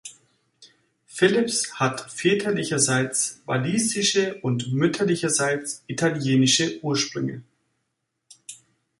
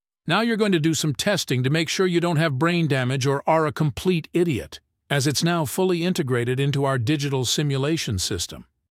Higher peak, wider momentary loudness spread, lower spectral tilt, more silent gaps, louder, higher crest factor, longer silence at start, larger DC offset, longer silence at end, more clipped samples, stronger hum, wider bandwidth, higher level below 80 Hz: about the same, -4 dBFS vs -4 dBFS; first, 12 LU vs 4 LU; second, -3.5 dB/octave vs -5 dB/octave; neither; about the same, -23 LUFS vs -22 LUFS; about the same, 20 dB vs 18 dB; second, 0.05 s vs 0.25 s; neither; first, 0.45 s vs 0.3 s; neither; neither; second, 11.5 kHz vs 16.5 kHz; second, -66 dBFS vs -52 dBFS